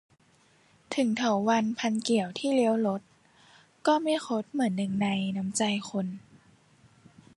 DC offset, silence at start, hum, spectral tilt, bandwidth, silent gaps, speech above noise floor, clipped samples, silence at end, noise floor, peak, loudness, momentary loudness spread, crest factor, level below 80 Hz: under 0.1%; 0.9 s; none; -5 dB/octave; 11.5 kHz; none; 36 dB; under 0.1%; 1.2 s; -63 dBFS; -12 dBFS; -28 LUFS; 8 LU; 18 dB; -72 dBFS